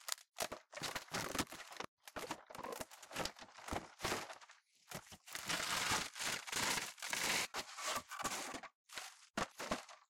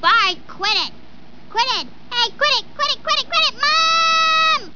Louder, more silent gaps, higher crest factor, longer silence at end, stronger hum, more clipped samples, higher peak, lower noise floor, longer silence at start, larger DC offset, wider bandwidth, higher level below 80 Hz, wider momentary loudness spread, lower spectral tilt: second, -42 LUFS vs -16 LUFS; first, 1.88-1.97 s, 8.75-8.84 s, 9.30-9.34 s vs none; first, 26 dB vs 16 dB; about the same, 0.1 s vs 0.05 s; neither; neither; second, -18 dBFS vs -4 dBFS; first, -65 dBFS vs -45 dBFS; about the same, 0 s vs 0 s; second, under 0.1% vs 2%; first, 17 kHz vs 5.4 kHz; second, -68 dBFS vs -54 dBFS; first, 14 LU vs 9 LU; first, -1.5 dB/octave vs 0 dB/octave